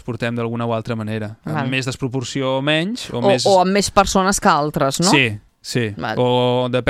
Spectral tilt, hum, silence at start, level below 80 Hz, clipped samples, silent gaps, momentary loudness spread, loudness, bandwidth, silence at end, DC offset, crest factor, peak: -4.5 dB/octave; none; 0.05 s; -42 dBFS; under 0.1%; none; 10 LU; -18 LUFS; 15.5 kHz; 0 s; under 0.1%; 18 dB; 0 dBFS